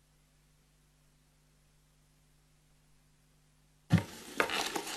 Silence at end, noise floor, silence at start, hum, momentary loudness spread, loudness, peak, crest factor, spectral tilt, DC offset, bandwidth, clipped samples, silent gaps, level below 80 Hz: 0 s; -68 dBFS; 3.9 s; 50 Hz at -65 dBFS; 4 LU; -33 LUFS; -12 dBFS; 28 dB; -4.5 dB/octave; under 0.1%; 14 kHz; under 0.1%; none; -64 dBFS